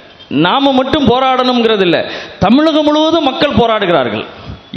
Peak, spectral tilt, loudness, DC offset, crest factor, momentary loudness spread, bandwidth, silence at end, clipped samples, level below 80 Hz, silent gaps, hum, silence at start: 0 dBFS; -6 dB/octave; -11 LUFS; under 0.1%; 12 dB; 9 LU; 7.6 kHz; 0 s; 0.3%; -38 dBFS; none; none; 0.2 s